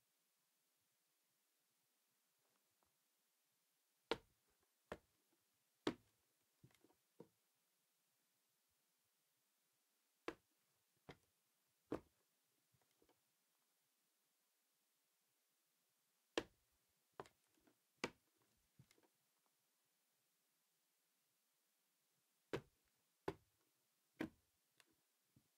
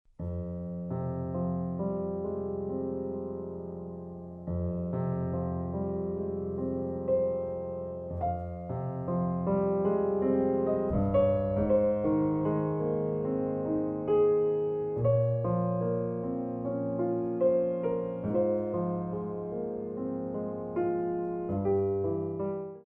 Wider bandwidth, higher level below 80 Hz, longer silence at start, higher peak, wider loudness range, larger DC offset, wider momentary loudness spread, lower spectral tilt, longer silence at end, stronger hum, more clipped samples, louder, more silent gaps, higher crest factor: first, 15.5 kHz vs 3.4 kHz; second, -84 dBFS vs -52 dBFS; first, 4.1 s vs 0.2 s; second, -22 dBFS vs -16 dBFS; about the same, 7 LU vs 7 LU; neither; first, 19 LU vs 9 LU; second, -4.5 dB/octave vs -12.5 dB/octave; first, 1.25 s vs 0.05 s; neither; neither; second, -53 LUFS vs -31 LUFS; neither; first, 38 dB vs 14 dB